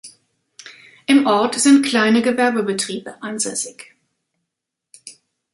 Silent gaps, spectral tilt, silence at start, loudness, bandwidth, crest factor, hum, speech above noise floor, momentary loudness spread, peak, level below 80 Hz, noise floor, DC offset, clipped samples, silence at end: none; -3 dB/octave; 0.05 s; -17 LUFS; 11.5 kHz; 18 dB; none; 64 dB; 15 LU; -2 dBFS; -68 dBFS; -81 dBFS; under 0.1%; under 0.1%; 0.45 s